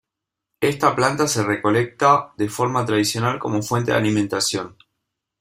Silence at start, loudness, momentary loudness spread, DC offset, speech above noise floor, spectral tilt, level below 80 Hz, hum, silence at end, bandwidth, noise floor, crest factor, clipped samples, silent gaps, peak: 0.6 s; -20 LUFS; 6 LU; under 0.1%; 64 dB; -4.5 dB/octave; -56 dBFS; none; 0.7 s; 16 kHz; -84 dBFS; 18 dB; under 0.1%; none; -2 dBFS